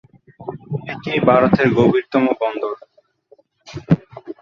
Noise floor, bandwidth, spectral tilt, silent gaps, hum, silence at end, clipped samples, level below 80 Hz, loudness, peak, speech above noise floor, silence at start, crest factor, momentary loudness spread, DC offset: -54 dBFS; 7.2 kHz; -8.5 dB/octave; none; none; 0.1 s; under 0.1%; -50 dBFS; -17 LUFS; 0 dBFS; 38 dB; 0.4 s; 18 dB; 21 LU; under 0.1%